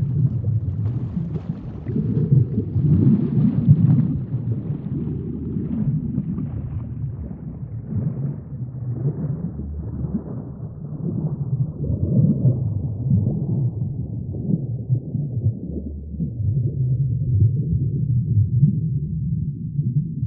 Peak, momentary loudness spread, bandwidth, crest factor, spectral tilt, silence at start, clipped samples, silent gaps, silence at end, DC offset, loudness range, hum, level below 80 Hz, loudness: -2 dBFS; 12 LU; 2.1 kHz; 20 dB; -14.5 dB/octave; 0 s; under 0.1%; none; 0 s; under 0.1%; 9 LU; none; -38 dBFS; -23 LUFS